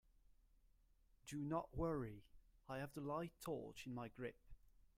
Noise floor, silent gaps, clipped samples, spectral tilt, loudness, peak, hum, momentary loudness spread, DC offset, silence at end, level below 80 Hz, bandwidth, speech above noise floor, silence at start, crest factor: -74 dBFS; none; under 0.1%; -6.5 dB/octave; -49 LUFS; -32 dBFS; none; 9 LU; under 0.1%; 0.1 s; -66 dBFS; 16 kHz; 27 dB; 1.25 s; 18 dB